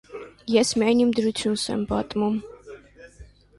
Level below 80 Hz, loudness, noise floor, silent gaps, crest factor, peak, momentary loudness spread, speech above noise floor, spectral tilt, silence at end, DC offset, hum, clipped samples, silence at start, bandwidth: -50 dBFS; -23 LUFS; -49 dBFS; none; 18 dB; -6 dBFS; 19 LU; 26 dB; -4.5 dB/octave; 0.35 s; under 0.1%; 50 Hz at -55 dBFS; under 0.1%; 0.1 s; 11.5 kHz